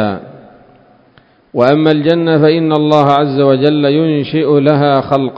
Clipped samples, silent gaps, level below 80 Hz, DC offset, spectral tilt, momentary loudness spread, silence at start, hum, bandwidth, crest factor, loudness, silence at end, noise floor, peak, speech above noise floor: 0.2%; none; -52 dBFS; under 0.1%; -8.5 dB/octave; 4 LU; 0 s; none; 7.2 kHz; 12 dB; -11 LUFS; 0 s; -48 dBFS; 0 dBFS; 37 dB